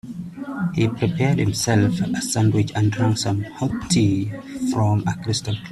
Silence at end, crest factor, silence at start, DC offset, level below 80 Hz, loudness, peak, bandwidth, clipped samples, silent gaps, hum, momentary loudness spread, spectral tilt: 0 s; 16 dB; 0.05 s; under 0.1%; -48 dBFS; -21 LUFS; -4 dBFS; 13 kHz; under 0.1%; none; none; 8 LU; -5.5 dB/octave